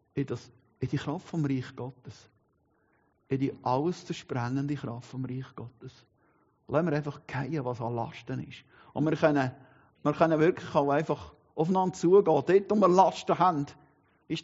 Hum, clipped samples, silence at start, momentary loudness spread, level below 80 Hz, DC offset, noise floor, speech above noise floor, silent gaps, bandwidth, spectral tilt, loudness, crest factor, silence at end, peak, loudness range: none; under 0.1%; 0.15 s; 17 LU; -66 dBFS; under 0.1%; -71 dBFS; 42 dB; none; 7.6 kHz; -6.5 dB/octave; -29 LUFS; 22 dB; 0 s; -8 dBFS; 10 LU